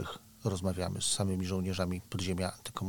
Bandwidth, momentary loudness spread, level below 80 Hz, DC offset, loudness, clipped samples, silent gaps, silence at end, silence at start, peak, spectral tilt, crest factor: 19 kHz; 6 LU; -56 dBFS; under 0.1%; -34 LUFS; under 0.1%; none; 0 s; 0 s; -16 dBFS; -4.5 dB/octave; 18 dB